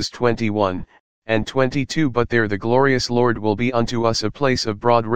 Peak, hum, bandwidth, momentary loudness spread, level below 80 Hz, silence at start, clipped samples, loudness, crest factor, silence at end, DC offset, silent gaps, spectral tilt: 0 dBFS; none; 9.6 kHz; 4 LU; -44 dBFS; 0 s; under 0.1%; -19 LUFS; 18 dB; 0 s; 2%; 1.00-1.22 s; -5.5 dB/octave